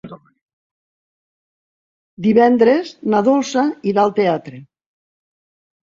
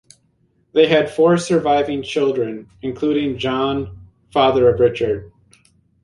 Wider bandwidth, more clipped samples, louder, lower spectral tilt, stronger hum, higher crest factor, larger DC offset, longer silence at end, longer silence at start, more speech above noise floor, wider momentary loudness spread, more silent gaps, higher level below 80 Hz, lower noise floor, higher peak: second, 7.6 kHz vs 11.5 kHz; neither; about the same, -16 LUFS vs -18 LUFS; about the same, -6 dB/octave vs -6 dB/octave; neither; about the same, 18 dB vs 18 dB; neither; first, 1.3 s vs 0.75 s; second, 0.05 s vs 0.75 s; first, over 75 dB vs 45 dB; second, 7 LU vs 12 LU; first, 0.42-0.47 s, 0.53-2.17 s vs none; second, -62 dBFS vs -46 dBFS; first, under -90 dBFS vs -61 dBFS; about the same, -2 dBFS vs -2 dBFS